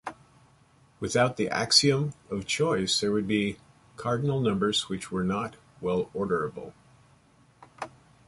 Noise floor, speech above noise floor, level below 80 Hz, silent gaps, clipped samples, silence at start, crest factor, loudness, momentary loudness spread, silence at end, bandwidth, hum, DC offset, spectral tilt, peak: -60 dBFS; 33 dB; -58 dBFS; none; under 0.1%; 0.05 s; 24 dB; -27 LUFS; 20 LU; 0.4 s; 11.5 kHz; none; under 0.1%; -4 dB/octave; -6 dBFS